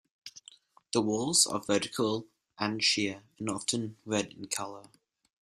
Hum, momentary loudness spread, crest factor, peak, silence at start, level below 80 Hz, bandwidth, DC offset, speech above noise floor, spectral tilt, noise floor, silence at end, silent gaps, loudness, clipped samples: none; 16 LU; 22 dB; -10 dBFS; 0.25 s; -70 dBFS; 13.5 kHz; under 0.1%; 27 dB; -2.5 dB/octave; -58 dBFS; 0.6 s; none; -30 LUFS; under 0.1%